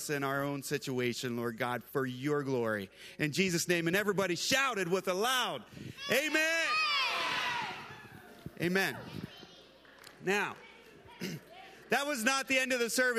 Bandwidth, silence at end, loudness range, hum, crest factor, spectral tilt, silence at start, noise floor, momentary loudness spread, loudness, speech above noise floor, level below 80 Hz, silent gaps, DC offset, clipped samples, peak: 15.5 kHz; 0 s; 7 LU; none; 20 dB; -3.5 dB/octave; 0 s; -57 dBFS; 18 LU; -32 LUFS; 24 dB; -72 dBFS; none; under 0.1%; under 0.1%; -14 dBFS